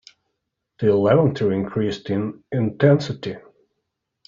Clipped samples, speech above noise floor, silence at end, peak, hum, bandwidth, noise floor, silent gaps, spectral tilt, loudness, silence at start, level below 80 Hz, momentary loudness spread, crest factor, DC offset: under 0.1%; 58 dB; 0.9 s; -4 dBFS; none; 7.4 kHz; -78 dBFS; none; -7 dB/octave; -20 LUFS; 0.8 s; -56 dBFS; 13 LU; 18 dB; under 0.1%